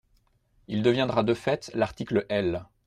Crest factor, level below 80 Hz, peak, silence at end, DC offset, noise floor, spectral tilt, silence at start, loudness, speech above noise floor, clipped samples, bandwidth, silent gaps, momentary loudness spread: 18 dB; -56 dBFS; -10 dBFS; 0.25 s; under 0.1%; -66 dBFS; -6.5 dB/octave; 0.7 s; -27 LUFS; 40 dB; under 0.1%; 11 kHz; none; 6 LU